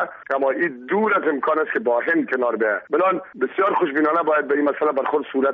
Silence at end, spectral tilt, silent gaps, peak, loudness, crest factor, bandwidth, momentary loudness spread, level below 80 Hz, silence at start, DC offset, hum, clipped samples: 0 s; -3.5 dB/octave; none; -8 dBFS; -20 LUFS; 12 dB; 5 kHz; 4 LU; -70 dBFS; 0 s; under 0.1%; none; under 0.1%